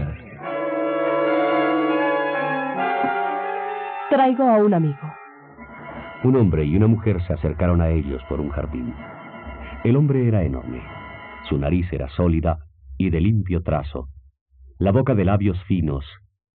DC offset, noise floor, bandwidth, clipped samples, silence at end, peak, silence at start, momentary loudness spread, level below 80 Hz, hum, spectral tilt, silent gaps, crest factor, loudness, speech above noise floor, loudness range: under 0.1%; -42 dBFS; 4.5 kHz; under 0.1%; 0.4 s; -4 dBFS; 0 s; 18 LU; -36 dBFS; none; -7.5 dB/octave; 14.41-14.46 s; 18 dB; -21 LUFS; 23 dB; 3 LU